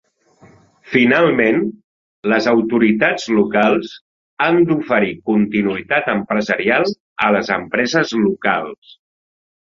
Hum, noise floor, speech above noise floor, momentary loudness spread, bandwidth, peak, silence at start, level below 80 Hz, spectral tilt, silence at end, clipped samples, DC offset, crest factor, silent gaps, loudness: none; -50 dBFS; 34 dB; 6 LU; 7.6 kHz; 0 dBFS; 0.85 s; -56 dBFS; -6 dB/octave; 1 s; under 0.1%; under 0.1%; 16 dB; 1.84-2.23 s, 4.01-4.37 s, 7.00-7.16 s; -16 LUFS